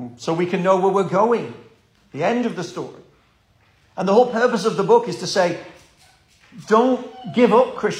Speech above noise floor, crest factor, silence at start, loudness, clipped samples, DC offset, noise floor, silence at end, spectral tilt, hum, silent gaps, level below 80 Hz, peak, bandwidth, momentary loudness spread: 40 dB; 18 dB; 0 s; -19 LUFS; under 0.1%; under 0.1%; -58 dBFS; 0 s; -5.5 dB/octave; none; none; -64 dBFS; -2 dBFS; 11.5 kHz; 15 LU